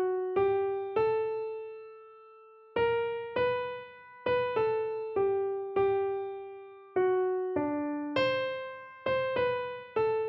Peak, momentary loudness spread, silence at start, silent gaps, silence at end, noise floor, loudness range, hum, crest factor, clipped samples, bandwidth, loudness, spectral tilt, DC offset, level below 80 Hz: -16 dBFS; 14 LU; 0 s; none; 0 s; -55 dBFS; 2 LU; none; 14 dB; under 0.1%; 5.8 kHz; -31 LUFS; -7.5 dB/octave; under 0.1%; -66 dBFS